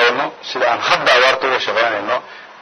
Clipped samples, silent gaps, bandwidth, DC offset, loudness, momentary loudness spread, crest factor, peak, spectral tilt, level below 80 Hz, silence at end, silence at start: under 0.1%; none; 12 kHz; under 0.1%; -15 LUFS; 10 LU; 16 dB; 0 dBFS; -2 dB/octave; -60 dBFS; 0 s; 0 s